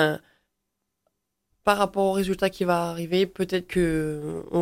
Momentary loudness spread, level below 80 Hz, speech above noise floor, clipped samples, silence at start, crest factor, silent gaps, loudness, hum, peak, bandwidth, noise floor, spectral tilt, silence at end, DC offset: 5 LU; -50 dBFS; 56 dB; under 0.1%; 0 s; 22 dB; none; -25 LUFS; none; -4 dBFS; 16.5 kHz; -81 dBFS; -5.5 dB/octave; 0 s; under 0.1%